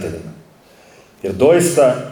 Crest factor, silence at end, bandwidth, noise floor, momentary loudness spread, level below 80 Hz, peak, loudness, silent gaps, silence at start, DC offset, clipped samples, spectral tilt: 16 dB; 0 s; 19 kHz; -47 dBFS; 20 LU; -50 dBFS; -2 dBFS; -14 LUFS; none; 0 s; under 0.1%; under 0.1%; -5 dB/octave